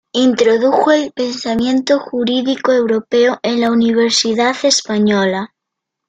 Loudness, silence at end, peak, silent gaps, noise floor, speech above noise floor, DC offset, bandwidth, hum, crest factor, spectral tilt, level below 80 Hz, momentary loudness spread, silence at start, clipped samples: -14 LUFS; 0.6 s; -2 dBFS; none; -79 dBFS; 65 dB; under 0.1%; 9.4 kHz; none; 12 dB; -3.5 dB/octave; -56 dBFS; 6 LU; 0.15 s; under 0.1%